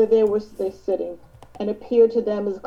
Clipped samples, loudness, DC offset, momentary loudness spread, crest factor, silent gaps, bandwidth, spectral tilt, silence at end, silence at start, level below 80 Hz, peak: under 0.1%; -22 LUFS; 0.1%; 13 LU; 16 dB; none; 6.8 kHz; -8 dB/octave; 0 s; 0 s; -54 dBFS; -6 dBFS